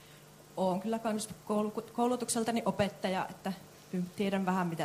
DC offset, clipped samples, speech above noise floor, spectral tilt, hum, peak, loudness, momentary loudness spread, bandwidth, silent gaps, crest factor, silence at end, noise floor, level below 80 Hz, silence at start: under 0.1%; under 0.1%; 22 dB; -5 dB/octave; none; -16 dBFS; -34 LUFS; 9 LU; 15.5 kHz; none; 18 dB; 0 s; -55 dBFS; -68 dBFS; 0 s